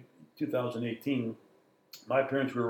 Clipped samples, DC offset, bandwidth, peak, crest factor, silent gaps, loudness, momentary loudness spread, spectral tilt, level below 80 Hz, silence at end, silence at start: under 0.1%; under 0.1%; 18.5 kHz; -14 dBFS; 20 dB; none; -33 LUFS; 21 LU; -7 dB/octave; -84 dBFS; 0 s; 0 s